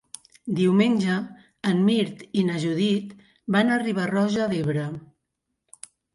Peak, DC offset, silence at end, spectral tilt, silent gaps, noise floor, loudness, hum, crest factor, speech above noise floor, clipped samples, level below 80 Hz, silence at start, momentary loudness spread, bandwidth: -8 dBFS; under 0.1%; 1.15 s; -6.5 dB/octave; none; -80 dBFS; -24 LUFS; none; 16 dB; 57 dB; under 0.1%; -64 dBFS; 0.45 s; 19 LU; 11.5 kHz